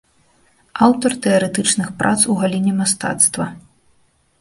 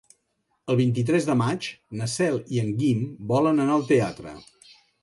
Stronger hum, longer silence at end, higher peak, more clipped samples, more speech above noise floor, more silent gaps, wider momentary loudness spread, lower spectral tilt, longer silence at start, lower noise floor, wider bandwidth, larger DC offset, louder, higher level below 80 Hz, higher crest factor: neither; first, 0.85 s vs 0.6 s; first, 0 dBFS vs -8 dBFS; neither; second, 42 dB vs 50 dB; neither; second, 4 LU vs 13 LU; second, -3.5 dB/octave vs -6.5 dB/octave; about the same, 0.75 s vs 0.65 s; second, -58 dBFS vs -73 dBFS; about the same, 12 kHz vs 11.5 kHz; neither; first, -16 LUFS vs -24 LUFS; first, -54 dBFS vs -60 dBFS; about the same, 18 dB vs 16 dB